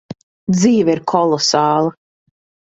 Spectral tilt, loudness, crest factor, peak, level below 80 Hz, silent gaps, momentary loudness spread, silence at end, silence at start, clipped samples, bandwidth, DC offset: -5 dB/octave; -15 LUFS; 16 dB; 0 dBFS; -56 dBFS; 0.23-0.47 s; 10 LU; 0.8 s; 0.1 s; under 0.1%; 8 kHz; under 0.1%